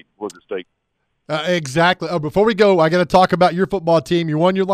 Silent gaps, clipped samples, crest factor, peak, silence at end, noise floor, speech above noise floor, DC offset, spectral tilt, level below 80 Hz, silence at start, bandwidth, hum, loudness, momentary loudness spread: none; under 0.1%; 14 dB; -2 dBFS; 0 s; -71 dBFS; 55 dB; under 0.1%; -6 dB/octave; -48 dBFS; 0.2 s; 14.5 kHz; none; -16 LUFS; 16 LU